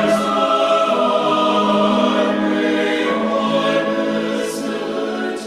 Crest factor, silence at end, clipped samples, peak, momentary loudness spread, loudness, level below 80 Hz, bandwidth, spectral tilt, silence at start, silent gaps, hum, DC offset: 14 dB; 0 s; under 0.1%; -2 dBFS; 7 LU; -17 LUFS; -58 dBFS; 14.5 kHz; -5 dB/octave; 0 s; none; none; under 0.1%